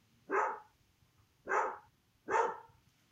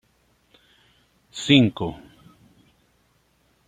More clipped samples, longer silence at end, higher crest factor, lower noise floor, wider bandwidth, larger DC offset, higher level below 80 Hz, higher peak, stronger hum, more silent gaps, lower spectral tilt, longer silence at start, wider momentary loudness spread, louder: neither; second, 0.45 s vs 1.7 s; about the same, 22 dB vs 24 dB; first, -71 dBFS vs -64 dBFS; first, 15 kHz vs 9.4 kHz; neither; second, -80 dBFS vs -58 dBFS; second, -18 dBFS vs -2 dBFS; neither; neither; second, -3.5 dB/octave vs -5.5 dB/octave; second, 0.3 s vs 1.35 s; second, 18 LU vs 23 LU; second, -36 LUFS vs -20 LUFS